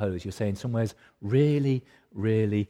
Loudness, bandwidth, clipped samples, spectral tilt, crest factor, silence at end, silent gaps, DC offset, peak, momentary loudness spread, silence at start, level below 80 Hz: -27 LUFS; 12.5 kHz; under 0.1%; -8 dB/octave; 16 dB; 0.05 s; none; under 0.1%; -12 dBFS; 10 LU; 0 s; -58 dBFS